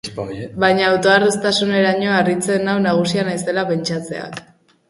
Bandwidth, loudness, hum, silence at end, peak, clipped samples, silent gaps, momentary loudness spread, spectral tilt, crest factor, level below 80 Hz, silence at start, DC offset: 11.5 kHz; -17 LUFS; none; 0.5 s; 0 dBFS; under 0.1%; none; 14 LU; -4.5 dB/octave; 16 dB; -54 dBFS; 0.05 s; under 0.1%